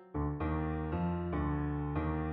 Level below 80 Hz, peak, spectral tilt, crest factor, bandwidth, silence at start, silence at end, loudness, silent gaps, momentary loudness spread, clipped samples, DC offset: -42 dBFS; -22 dBFS; -8.5 dB/octave; 12 dB; 4.1 kHz; 0 s; 0 s; -36 LUFS; none; 1 LU; under 0.1%; under 0.1%